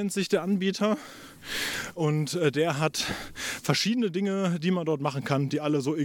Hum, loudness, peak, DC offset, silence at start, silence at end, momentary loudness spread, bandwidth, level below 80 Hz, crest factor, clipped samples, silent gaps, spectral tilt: none; -27 LUFS; -8 dBFS; under 0.1%; 0 s; 0 s; 7 LU; 18.5 kHz; -60 dBFS; 18 dB; under 0.1%; none; -5 dB/octave